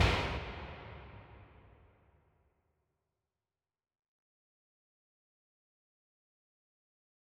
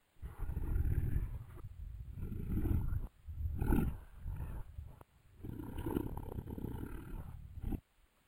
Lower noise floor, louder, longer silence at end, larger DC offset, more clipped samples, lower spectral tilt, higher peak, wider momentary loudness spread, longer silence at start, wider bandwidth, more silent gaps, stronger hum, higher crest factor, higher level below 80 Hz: first, under -90 dBFS vs -63 dBFS; first, -38 LUFS vs -42 LUFS; first, 5.95 s vs 0.45 s; neither; neither; second, -5 dB/octave vs -8.5 dB/octave; about the same, -16 dBFS vs -18 dBFS; first, 24 LU vs 14 LU; second, 0 s vs 0.2 s; second, 12 kHz vs 16.5 kHz; neither; neither; first, 28 dB vs 22 dB; second, -48 dBFS vs -42 dBFS